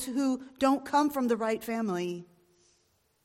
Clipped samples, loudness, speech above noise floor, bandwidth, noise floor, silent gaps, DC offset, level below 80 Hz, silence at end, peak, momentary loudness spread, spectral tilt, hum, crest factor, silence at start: under 0.1%; -29 LUFS; 42 dB; 16.5 kHz; -71 dBFS; none; under 0.1%; -68 dBFS; 1 s; -14 dBFS; 7 LU; -5 dB/octave; none; 16 dB; 0 s